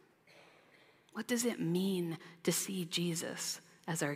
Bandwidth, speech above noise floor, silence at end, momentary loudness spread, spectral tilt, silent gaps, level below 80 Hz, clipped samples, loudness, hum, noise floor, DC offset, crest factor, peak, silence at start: 16 kHz; 29 dB; 0 s; 8 LU; -4 dB/octave; none; -86 dBFS; under 0.1%; -37 LUFS; none; -65 dBFS; under 0.1%; 20 dB; -18 dBFS; 0.35 s